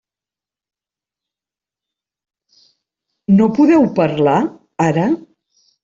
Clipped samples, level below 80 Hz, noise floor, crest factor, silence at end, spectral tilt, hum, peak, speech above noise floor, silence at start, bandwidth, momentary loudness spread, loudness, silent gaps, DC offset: under 0.1%; -58 dBFS; -89 dBFS; 16 dB; 0.65 s; -8 dB/octave; none; -2 dBFS; 77 dB; 3.3 s; 7.6 kHz; 11 LU; -15 LUFS; none; under 0.1%